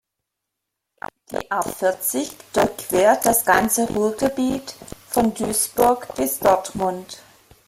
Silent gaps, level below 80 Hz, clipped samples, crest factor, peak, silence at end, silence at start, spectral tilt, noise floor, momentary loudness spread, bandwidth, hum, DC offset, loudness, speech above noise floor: none; -50 dBFS; under 0.1%; 18 dB; -2 dBFS; 0.5 s; 1.3 s; -3.5 dB/octave; -81 dBFS; 18 LU; 16.5 kHz; none; under 0.1%; -20 LUFS; 60 dB